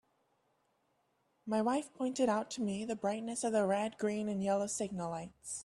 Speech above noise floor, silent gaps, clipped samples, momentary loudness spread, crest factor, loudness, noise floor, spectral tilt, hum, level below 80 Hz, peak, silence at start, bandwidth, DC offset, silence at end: 42 dB; none; under 0.1%; 8 LU; 16 dB; -36 LUFS; -77 dBFS; -5 dB/octave; none; -74 dBFS; -20 dBFS; 1.45 s; 12.5 kHz; under 0.1%; 0 s